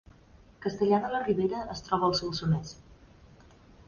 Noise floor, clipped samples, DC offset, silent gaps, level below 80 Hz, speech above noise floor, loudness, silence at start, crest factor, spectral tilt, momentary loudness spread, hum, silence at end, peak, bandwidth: -56 dBFS; under 0.1%; under 0.1%; none; -54 dBFS; 28 dB; -29 LUFS; 0.6 s; 18 dB; -6 dB/octave; 10 LU; none; 0.95 s; -12 dBFS; 7.2 kHz